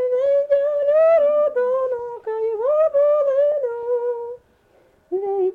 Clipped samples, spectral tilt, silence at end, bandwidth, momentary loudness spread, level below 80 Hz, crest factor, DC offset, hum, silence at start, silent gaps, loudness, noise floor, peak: under 0.1%; -6 dB/octave; 0 s; 4.1 kHz; 12 LU; -64 dBFS; 10 dB; under 0.1%; none; 0 s; none; -19 LUFS; -57 dBFS; -10 dBFS